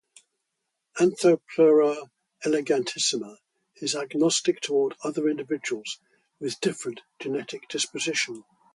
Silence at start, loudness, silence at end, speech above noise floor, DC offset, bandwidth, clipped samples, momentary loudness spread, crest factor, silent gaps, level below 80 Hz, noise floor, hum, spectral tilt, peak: 0.95 s; -25 LUFS; 0.35 s; 56 dB; under 0.1%; 11.5 kHz; under 0.1%; 15 LU; 18 dB; none; -76 dBFS; -81 dBFS; none; -3.5 dB/octave; -8 dBFS